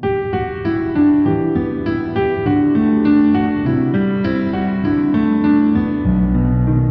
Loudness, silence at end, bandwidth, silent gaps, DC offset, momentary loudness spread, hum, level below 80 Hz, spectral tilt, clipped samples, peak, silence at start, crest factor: -16 LUFS; 0 s; 5 kHz; none; under 0.1%; 6 LU; none; -30 dBFS; -11 dB/octave; under 0.1%; -4 dBFS; 0 s; 12 dB